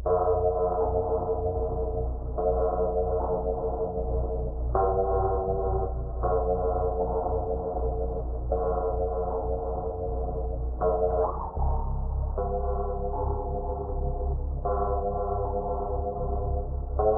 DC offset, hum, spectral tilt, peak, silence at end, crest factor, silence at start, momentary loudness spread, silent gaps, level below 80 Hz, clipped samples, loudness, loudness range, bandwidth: under 0.1%; none; -8 dB/octave; -10 dBFS; 0 s; 16 dB; 0 s; 6 LU; none; -32 dBFS; under 0.1%; -29 LUFS; 3 LU; 1.7 kHz